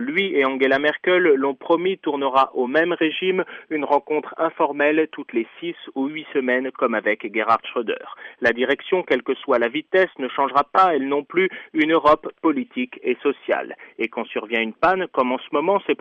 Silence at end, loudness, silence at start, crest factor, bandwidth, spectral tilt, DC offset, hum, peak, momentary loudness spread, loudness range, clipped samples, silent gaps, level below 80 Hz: 0.05 s; -21 LUFS; 0 s; 16 dB; 7 kHz; -6.5 dB/octave; under 0.1%; none; -4 dBFS; 9 LU; 4 LU; under 0.1%; none; -62 dBFS